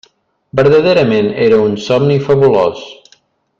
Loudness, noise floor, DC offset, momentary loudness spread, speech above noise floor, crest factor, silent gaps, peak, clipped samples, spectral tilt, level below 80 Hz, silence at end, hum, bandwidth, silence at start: -11 LUFS; -52 dBFS; under 0.1%; 6 LU; 41 dB; 12 dB; none; 0 dBFS; under 0.1%; -7 dB/octave; -48 dBFS; 0.65 s; none; 7.4 kHz; 0.55 s